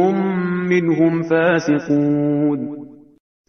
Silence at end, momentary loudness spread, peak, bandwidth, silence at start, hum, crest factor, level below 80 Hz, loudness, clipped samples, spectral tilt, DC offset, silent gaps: 0.55 s; 6 LU; -4 dBFS; 6.6 kHz; 0 s; none; 14 dB; -62 dBFS; -18 LUFS; under 0.1%; -7.5 dB/octave; under 0.1%; none